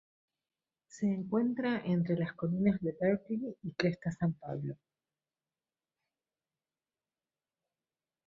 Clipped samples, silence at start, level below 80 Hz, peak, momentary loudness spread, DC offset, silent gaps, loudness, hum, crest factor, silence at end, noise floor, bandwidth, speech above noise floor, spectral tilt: under 0.1%; 0.95 s; -70 dBFS; -14 dBFS; 9 LU; under 0.1%; none; -34 LUFS; none; 22 dB; 3.55 s; under -90 dBFS; 7.6 kHz; over 57 dB; -8 dB/octave